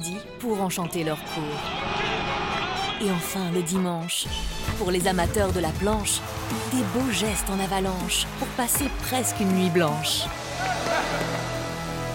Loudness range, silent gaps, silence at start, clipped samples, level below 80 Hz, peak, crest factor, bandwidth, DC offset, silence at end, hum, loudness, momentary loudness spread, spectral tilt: 2 LU; none; 0 s; under 0.1%; -40 dBFS; -10 dBFS; 16 dB; 17 kHz; under 0.1%; 0 s; none; -26 LUFS; 7 LU; -4 dB/octave